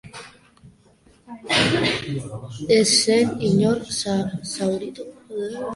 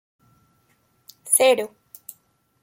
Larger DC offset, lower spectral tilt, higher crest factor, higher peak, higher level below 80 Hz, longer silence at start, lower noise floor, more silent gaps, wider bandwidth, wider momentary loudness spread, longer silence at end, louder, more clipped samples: neither; first, -4 dB/octave vs 0 dB/octave; about the same, 18 dB vs 22 dB; about the same, -4 dBFS vs -4 dBFS; first, -54 dBFS vs -78 dBFS; second, 0.05 s vs 1.25 s; second, -55 dBFS vs -65 dBFS; neither; second, 11.5 kHz vs 16.5 kHz; second, 19 LU vs 26 LU; second, 0 s vs 0.95 s; second, -21 LUFS vs -18 LUFS; neither